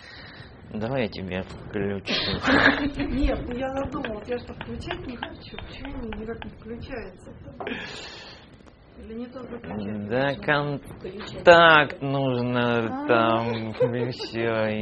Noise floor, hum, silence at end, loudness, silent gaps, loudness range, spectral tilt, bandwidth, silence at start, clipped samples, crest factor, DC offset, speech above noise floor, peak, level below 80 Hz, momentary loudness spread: -50 dBFS; none; 0 s; -24 LUFS; none; 16 LU; -6 dB/octave; 8.4 kHz; 0 s; under 0.1%; 24 dB; under 0.1%; 25 dB; -2 dBFS; -42 dBFS; 20 LU